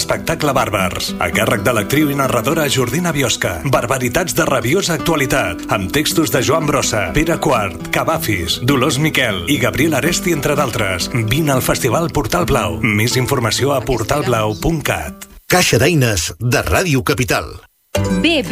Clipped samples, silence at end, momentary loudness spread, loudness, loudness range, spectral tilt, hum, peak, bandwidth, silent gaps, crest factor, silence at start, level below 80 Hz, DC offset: under 0.1%; 0 s; 4 LU; -16 LUFS; 1 LU; -4.5 dB/octave; none; 0 dBFS; 16 kHz; none; 14 dB; 0 s; -34 dBFS; under 0.1%